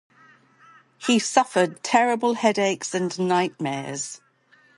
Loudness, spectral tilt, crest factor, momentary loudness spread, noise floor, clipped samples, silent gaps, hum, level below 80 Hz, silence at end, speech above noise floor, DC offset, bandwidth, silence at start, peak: -23 LUFS; -4 dB/octave; 22 dB; 11 LU; -59 dBFS; under 0.1%; none; none; -74 dBFS; 0.6 s; 36 dB; under 0.1%; 11.5 kHz; 1 s; -2 dBFS